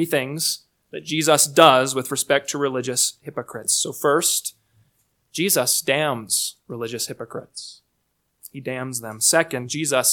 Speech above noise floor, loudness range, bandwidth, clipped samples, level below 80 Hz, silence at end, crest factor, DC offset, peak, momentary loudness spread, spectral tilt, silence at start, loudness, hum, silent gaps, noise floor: 50 dB; 6 LU; 19 kHz; under 0.1%; -70 dBFS; 0 s; 22 dB; under 0.1%; 0 dBFS; 17 LU; -2 dB/octave; 0 s; -20 LUFS; none; none; -72 dBFS